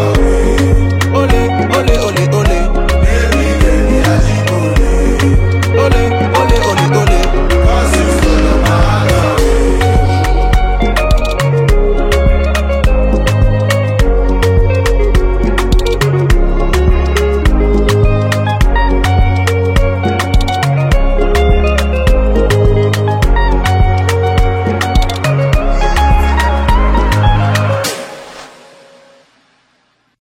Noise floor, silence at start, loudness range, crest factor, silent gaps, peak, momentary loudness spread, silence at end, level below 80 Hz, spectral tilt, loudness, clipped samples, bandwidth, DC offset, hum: -57 dBFS; 0 s; 1 LU; 10 dB; none; 0 dBFS; 3 LU; 1.85 s; -12 dBFS; -6 dB/octave; -12 LUFS; under 0.1%; 15.5 kHz; under 0.1%; none